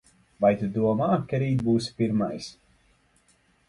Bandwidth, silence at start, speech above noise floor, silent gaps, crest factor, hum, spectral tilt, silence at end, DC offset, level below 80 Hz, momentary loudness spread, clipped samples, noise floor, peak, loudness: 11.5 kHz; 0.4 s; 40 dB; none; 18 dB; none; -7.5 dB/octave; 1.15 s; under 0.1%; -58 dBFS; 7 LU; under 0.1%; -64 dBFS; -8 dBFS; -25 LUFS